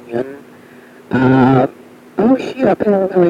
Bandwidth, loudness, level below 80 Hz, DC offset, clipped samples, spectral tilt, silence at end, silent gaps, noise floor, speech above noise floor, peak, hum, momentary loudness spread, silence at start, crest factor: 7.4 kHz; -14 LUFS; -48 dBFS; under 0.1%; under 0.1%; -9 dB/octave; 0 s; none; -40 dBFS; 27 dB; 0 dBFS; none; 12 LU; 0.05 s; 14 dB